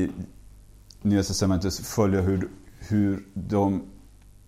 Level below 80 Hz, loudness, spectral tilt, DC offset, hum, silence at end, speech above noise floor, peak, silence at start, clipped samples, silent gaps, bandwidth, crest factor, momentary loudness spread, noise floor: -46 dBFS; -26 LUFS; -6 dB/octave; under 0.1%; none; 0.45 s; 26 dB; -10 dBFS; 0 s; under 0.1%; none; 15 kHz; 16 dB; 15 LU; -50 dBFS